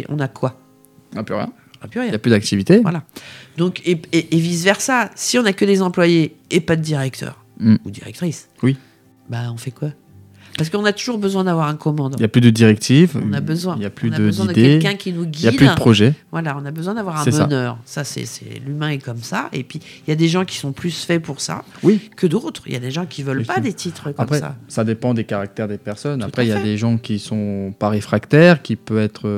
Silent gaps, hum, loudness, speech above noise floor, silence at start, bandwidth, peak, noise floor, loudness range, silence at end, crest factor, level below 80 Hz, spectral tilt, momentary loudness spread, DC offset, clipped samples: none; none; -18 LUFS; 27 dB; 0 s; 15.5 kHz; 0 dBFS; -44 dBFS; 7 LU; 0 s; 18 dB; -54 dBFS; -6 dB/octave; 14 LU; under 0.1%; under 0.1%